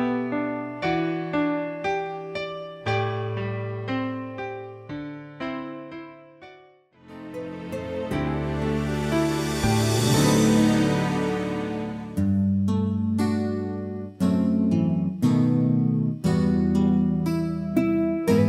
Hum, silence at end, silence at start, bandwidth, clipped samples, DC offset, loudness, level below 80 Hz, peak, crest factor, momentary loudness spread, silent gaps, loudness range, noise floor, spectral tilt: none; 0 s; 0 s; 16 kHz; under 0.1%; under 0.1%; -24 LUFS; -46 dBFS; -8 dBFS; 16 dB; 14 LU; none; 11 LU; -54 dBFS; -6.5 dB/octave